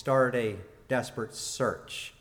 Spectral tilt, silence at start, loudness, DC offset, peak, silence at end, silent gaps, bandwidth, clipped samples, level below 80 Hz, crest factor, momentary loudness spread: -4.5 dB/octave; 0 s; -31 LUFS; under 0.1%; -12 dBFS; 0.1 s; none; 17.5 kHz; under 0.1%; -62 dBFS; 18 dB; 12 LU